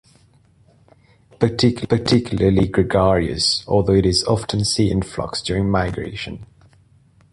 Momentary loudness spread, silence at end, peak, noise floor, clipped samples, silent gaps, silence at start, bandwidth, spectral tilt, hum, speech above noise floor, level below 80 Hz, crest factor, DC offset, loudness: 9 LU; 0.9 s; 0 dBFS; -54 dBFS; under 0.1%; none; 1.4 s; 11.5 kHz; -5.5 dB/octave; none; 36 dB; -36 dBFS; 20 dB; under 0.1%; -18 LUFS